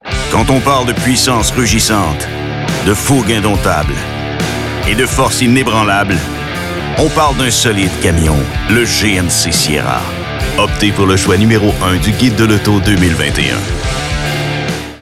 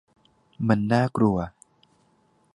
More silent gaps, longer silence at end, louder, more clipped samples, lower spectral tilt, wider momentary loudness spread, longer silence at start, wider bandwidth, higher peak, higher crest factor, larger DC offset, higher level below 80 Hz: neither; second, 0.05 s vs 1.05 s; first, -12 LUFS vs -24 LUFS; neither; second, -4 dB/octave vs -8 dB/octave; about the same, 7 LU vs 9 LU; second, 0.05 s vs 0.6 s; first, 16.5 kHz vs 11 kHz; first, 0 dBFS vs -4 dBFS; second, 12 dB vs 22 dB; neither; first, -24 dBFS vs -52 dBFS